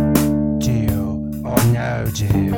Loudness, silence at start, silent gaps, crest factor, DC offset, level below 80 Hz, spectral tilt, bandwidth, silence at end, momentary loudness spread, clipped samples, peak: -19 LUFS; 0 s; none; 18 dB; under 0.1%; -32 dBFS; -6.5 dB/octave; 19 kHz; 0 s; 6 LU; under 0.1%; 0 dBFS